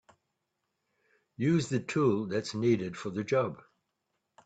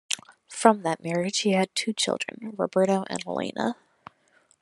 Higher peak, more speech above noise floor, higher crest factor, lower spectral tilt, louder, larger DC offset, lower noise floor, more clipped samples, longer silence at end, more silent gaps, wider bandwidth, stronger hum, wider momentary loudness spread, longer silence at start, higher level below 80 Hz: second, -16 dBFS vs -2 dBFS; first, 53 dB vs 38 dB; second, 18 dB vs 26 dB; first, -6.5 dB/octave vs -4 dB/octave; second, -30 LUFS vs -26 LUFS; neither; first, -83 dBFS vs -63 dBFS; neither; about the same, 0.85 s vs 0.9 s; neither; second, 9 kHz vs 12 kHz; neither; about the same, 8 LU vs 10 LU; first, 1.4 s vs 0.1 s; about the same, -70 dBFS vs -74 dBFS